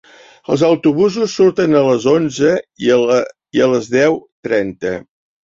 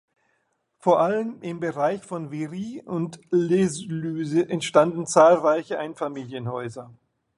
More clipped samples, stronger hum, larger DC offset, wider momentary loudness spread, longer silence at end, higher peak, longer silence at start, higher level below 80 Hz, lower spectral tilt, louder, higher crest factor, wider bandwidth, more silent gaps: neither; neither; neither; second, 9 LU vs 14 LU; about the same, 0.45 s vs 0.45 s; about the same, -2 dBFS vs -2 dBFS; second, 0.5 s vs 0.85 s; first, -54 dBFS vs -68 dBFS; about the same, -5.5 dB/octave vs -6 dB/octave; first, -15 LUFS vs -23 LUFS; second, 14 dB vs 20 dB; second, 7.8 kHz vs 11.5 kHz; first, 4.32-4.43 s vs none